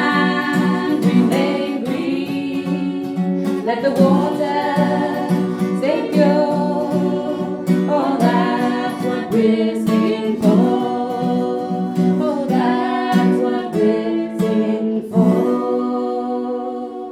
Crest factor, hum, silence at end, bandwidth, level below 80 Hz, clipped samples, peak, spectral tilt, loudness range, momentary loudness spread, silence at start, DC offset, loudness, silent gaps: 16 dB; none; 0 s; 14.5 kHz; -62 dBFS; under 0.1%; -2 dBFS; -7.5 dB/octave; 2 LU; 7 LU; 0 s; under 0.1%; -18 LUFS; none